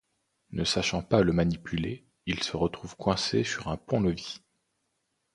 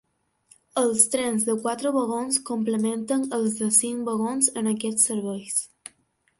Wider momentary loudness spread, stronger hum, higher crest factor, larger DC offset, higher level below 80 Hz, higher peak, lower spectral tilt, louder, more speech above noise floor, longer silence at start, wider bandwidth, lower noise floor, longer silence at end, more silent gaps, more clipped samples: first, 12 LU vs 8 LU; neither; about the same, 24 dB vs 22 dB; neither; first, -48 dBFS vs -70 dBFS; second, -6 dBFS vs -2 dBFS; first, -5 dB/octave vs -3 dB/octave; second, -29 LUFS vs -23 LUFS; first, 50 dB vs 43 dB; second, 0.5 s vs 0.75 s; about the same, 11 kHz vs 12 kHz; first, -78 dBFS vs -67 dBFS; first, 0.95 s vs 0.5 s; neither; neither